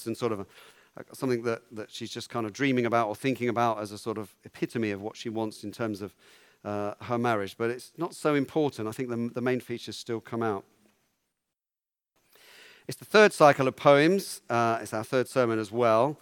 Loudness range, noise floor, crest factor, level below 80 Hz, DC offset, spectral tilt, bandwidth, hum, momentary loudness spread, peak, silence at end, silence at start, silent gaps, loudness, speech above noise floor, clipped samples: 11 LU; under -90 dBFS; 24 dB; -76 dBFS; under 0.1%; -5.5 dB/octave; 18 kHz; none; 16 LU; -4 dBFS; 0.05 s; 0 s; none; -28 LUFS; over 62 dB; under 0.1%